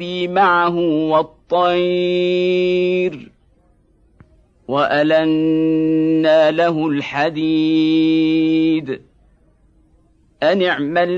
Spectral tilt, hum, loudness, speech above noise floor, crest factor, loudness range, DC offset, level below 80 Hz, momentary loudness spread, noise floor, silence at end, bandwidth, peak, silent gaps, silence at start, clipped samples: -7 dB/octave; none; -16 LUFS; 40 dB; 12 dB; 3 LU; under 0.1%; -56 dBFS; 6 LU; -55 dBFS; 0 s; 7 kHz; -4 dBFS; none; 0 s; under 0.1%